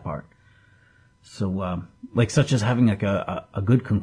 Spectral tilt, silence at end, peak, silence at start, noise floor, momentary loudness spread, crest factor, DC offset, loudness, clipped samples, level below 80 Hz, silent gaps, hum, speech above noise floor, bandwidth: -7 dB/octave; 0 s; -8 dBFS; 0.05 s; -57 dBFS; 11 LU; 16 dB; under 0.1%; -24 LUFS; under 0.1%; -52 dBFS; none; none; 35 dB; 10.5 kHz